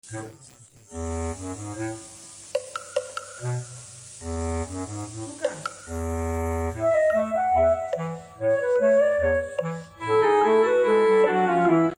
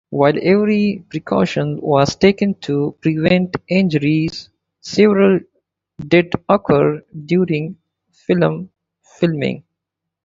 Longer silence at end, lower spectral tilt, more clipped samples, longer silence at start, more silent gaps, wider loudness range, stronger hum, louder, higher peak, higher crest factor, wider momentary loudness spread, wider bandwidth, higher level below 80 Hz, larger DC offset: second, 0.05 s vs 0.65 s; about the same, -6 dB/octave vs -7 dB/octave; neither; about the same, 0.05 s vs 0.1 s; neither; first, 12 LU vs 3 LU; neither; second, -24 LUFS vs -16 LUFS; second, -10 dBFS vs 0 dBFS; about the same, 16 dB vs 16 dB; first, 16 LU vs 13 LU; first, 16 kHz vs 7.6 kHz; first, -44 dBFS vs -50 dBFS; neither